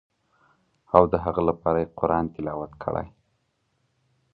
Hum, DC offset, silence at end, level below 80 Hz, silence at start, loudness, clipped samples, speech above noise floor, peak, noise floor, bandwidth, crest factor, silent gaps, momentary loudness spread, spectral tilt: none; under 0.1%; 1.25 s; -46 dBFS; 0.95 s; -24 LUFS; under 0.1%; 48 dB; 0 dBFS; -72 dBFS; 4.9 kHz; 26 dB; none; 12 LU; -11 dB/octave